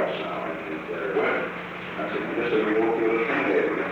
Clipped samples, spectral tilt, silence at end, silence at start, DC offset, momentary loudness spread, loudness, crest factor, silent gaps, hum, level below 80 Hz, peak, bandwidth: under 0.1%; -7 dB/octave; 0 s; 0 s; under 0.1%; 9 LU; -26 LUFS; 14 dB; none; none; -60 dBFS; -12 dBFS; 7.6 kHz